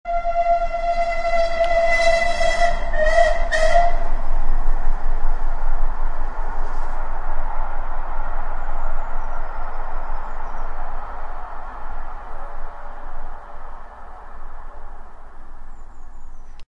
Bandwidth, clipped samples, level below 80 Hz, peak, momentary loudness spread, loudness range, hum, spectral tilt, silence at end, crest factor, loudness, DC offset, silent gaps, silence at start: 7.6 kHz; under 0.1%; -22 dBFS; -2 dBFS; 23 LU; 20 LU; none; -4 dB/octave; 0.05 s; 14 dB; -23 LUFS; under 0.1%; none; 0.05 s